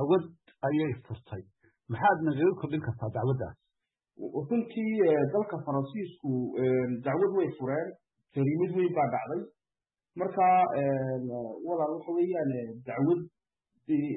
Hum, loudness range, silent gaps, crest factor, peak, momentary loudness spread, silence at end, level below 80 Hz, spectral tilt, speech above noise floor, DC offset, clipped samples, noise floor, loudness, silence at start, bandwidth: none; 2 LU; none; 16 dB; -14 dBFS; 15 LU; 0 s; -68 dBFS; -12 dB/octave; over 61 dB; under 0.1%; under 0.1%; under -90 dBFS; -30 LUFS; 0 s; 4 kHz